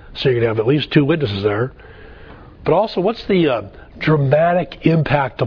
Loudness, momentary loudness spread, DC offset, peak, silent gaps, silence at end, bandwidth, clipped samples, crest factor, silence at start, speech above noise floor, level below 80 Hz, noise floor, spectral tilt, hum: -17 LUFS; 8 LU; under 0.1%; 0 dBFS; none; 0 s; 5.4 kHz; under 0.1%; 18 dB; 0.05 s; 23 dB; -42 dBFS; -39 dBFS; -9 dB/octave; none